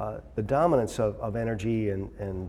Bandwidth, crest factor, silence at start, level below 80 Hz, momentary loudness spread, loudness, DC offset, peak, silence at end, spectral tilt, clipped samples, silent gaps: 14 kHz; 18 dB; 0 s; -46 dBFS; 11 LU; -28 LUFS; under 0.1%; -10 dBFS; 0 s; -7.5 dB/octave; under 0.1%; none